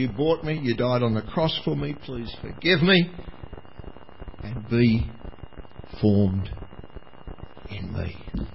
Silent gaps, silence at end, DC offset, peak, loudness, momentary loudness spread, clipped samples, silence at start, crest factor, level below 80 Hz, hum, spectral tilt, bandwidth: none; 0.05 s; 0.8%; -4 dBFS; -24 LUFS; 24 LU; under 0.1%; 0 s; 20 dB; -40 dBFS; none; -10.5 dB/octave; 5.8 kHz